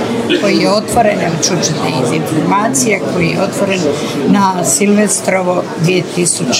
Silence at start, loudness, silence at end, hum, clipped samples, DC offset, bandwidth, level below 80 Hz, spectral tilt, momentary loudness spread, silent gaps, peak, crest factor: 0 s; -12 LUFS; 0 s; none; under 0.1%; under 0.1%; 16 kHz; -50 dBFS; -4 dB/octave; 4 LU; none; 0 dBFS; 12 dB